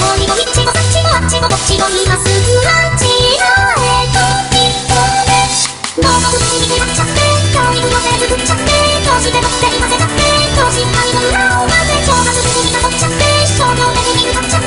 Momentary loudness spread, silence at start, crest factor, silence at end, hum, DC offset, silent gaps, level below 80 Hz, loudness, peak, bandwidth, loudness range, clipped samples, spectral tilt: 2 LU; 0 s; 10 dB; 0 s; none; under 0.1%; none; -24 dBFS; -10 LUFS; 0 dBFS; 11.5 kHz; 1 LU; under 0.1%; -3 dB/octave